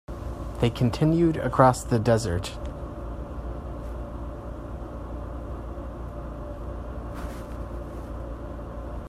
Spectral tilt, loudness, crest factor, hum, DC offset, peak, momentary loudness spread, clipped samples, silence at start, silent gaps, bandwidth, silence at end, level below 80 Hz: -7 dB/octave; -29 LUFS; 24 dB; none; under 0.1%; -4 dBFS; 15 LU; under 0.1%; 0.1 s; none; 15 kHz; 0 s; -38 dBFS